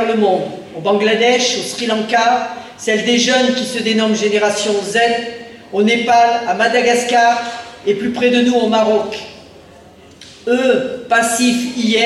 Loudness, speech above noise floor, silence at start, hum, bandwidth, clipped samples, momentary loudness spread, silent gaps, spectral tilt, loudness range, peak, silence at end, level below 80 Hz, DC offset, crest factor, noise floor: -14 LUFS; 27 dB; 0 s; none; 13 kHz; under 0.1%; 11 LU; none; -3 dB/octave; 3 LU; -2 dBFS; 0 s; -60 dBFS; under 0.1%; 12 dB; -41 dBFS